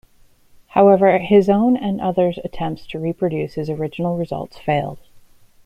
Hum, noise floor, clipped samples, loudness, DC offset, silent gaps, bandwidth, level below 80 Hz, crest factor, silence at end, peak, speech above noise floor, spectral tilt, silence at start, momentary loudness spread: none; -51 dBFS; under 0.1%; -18 LUFS; under 0.1%; none; 9.4 kHz; -48 dBFS; 16 dB; 0.45 s; -2 dBFS; 34 dB; -8.5 dB/octave; 0.75 s; 13 LU